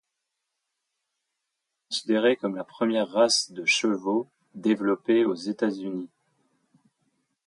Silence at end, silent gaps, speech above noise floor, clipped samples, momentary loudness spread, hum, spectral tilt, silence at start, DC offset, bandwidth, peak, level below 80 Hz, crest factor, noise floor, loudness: 1.4 s; none; 57 dB; under 0.1%; 11 LU; none; -3.5 dB/octave; 1.9 s; under 0.1%; 11.5 kHz; -8 dBFS; -78 dBFS; 18 dB; -82 dBFS; -25 LUFS